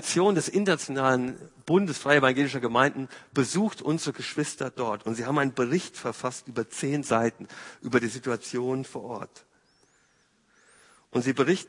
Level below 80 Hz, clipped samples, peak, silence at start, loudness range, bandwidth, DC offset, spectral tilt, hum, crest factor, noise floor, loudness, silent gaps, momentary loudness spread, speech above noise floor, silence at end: -70 dBFS; under 0.1%; -4 dBFS; 0 s; 8 LU; 11 kHz; under 0.1%; -5 dB/octave; none; 24 dB; -66 dBFS; -27 LUFS; none; 12 LU; 39 dB; 0 s